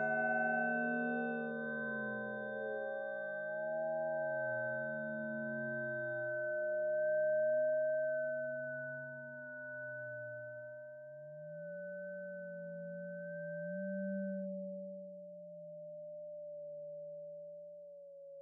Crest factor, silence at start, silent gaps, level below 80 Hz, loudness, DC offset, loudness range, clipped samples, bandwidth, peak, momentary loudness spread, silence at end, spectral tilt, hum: 16 dB; 0 s; none; under -90 dBFS; -40 LUFS; under 0.1%; 11 LU; under 0.1%; 3.9 kHz; -24 dBFS; 16 LU; 0 s; -6.5 dB/octave; none